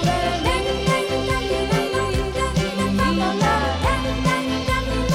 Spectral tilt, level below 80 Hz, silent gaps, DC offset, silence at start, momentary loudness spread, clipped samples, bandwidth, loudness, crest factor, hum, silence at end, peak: -5 dB/octave; -30 dBFS; none; under 0.1%; 0 s; 3 LU; under 0.1%; 16.5 kHz; -21 LUFS; 14 dB; none; 0 s; -6 dBFS